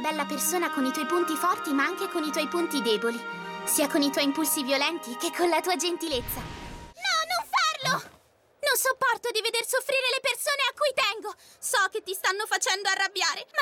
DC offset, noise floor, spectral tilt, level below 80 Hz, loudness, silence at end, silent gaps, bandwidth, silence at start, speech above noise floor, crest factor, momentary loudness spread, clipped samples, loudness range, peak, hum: under 0.1%; -60 dBFS; -1.5 dB/octave; -56 dBFS; -26 LUFS; 0 s; none; 18 kHz; 0 s; 33 dB; 16 dB; 7 LU; under 0.1%; 2 LU; -10 dBFS; none